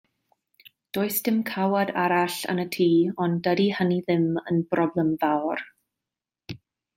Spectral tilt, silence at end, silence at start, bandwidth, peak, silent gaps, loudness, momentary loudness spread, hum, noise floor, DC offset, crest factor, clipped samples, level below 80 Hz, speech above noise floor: -6 dB/octave; 0.4 s; 0.95 s; 16.5 kHz; -10 dBFS; none; -24 LUFS; 12 LU; none; -89 dBFS; under 0.1%; 16 dB; under 0.1%; -68 dBFS; 65 dB